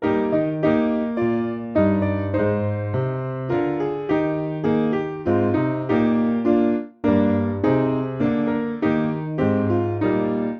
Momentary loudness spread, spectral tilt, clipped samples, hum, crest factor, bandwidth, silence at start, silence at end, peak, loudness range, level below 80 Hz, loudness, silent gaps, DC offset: 5 LU; -10 dB/octave; under 0.1%; none; 14 dB; 5.8 kHz; 0 s; 0 s; -6 dBFS; 2 LU; -50 dBFS; -21 LUFS; none; under 0.1%